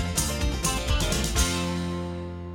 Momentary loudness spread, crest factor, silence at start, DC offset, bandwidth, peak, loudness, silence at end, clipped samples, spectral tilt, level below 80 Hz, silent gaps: 8 LU; 18 dB; 0 s; under 0.1%; 18 kHz; -10 dBFS; -27 LUFS; 0 s; under 0.1%; -3.5 dB/octave; -32 dBFS; none